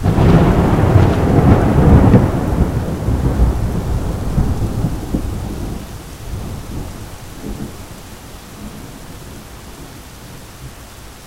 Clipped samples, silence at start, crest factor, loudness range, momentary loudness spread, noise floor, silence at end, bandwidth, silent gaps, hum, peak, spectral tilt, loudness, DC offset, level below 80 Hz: under 0.1%; 0 s; 16 dB; 19 LU; 23 LU; -35 dBFS; 0 s; 16 kHz; none; none; 0 dBFS; -8 dB/octave; -15 LUFS; under 0.1%; -22 dBFS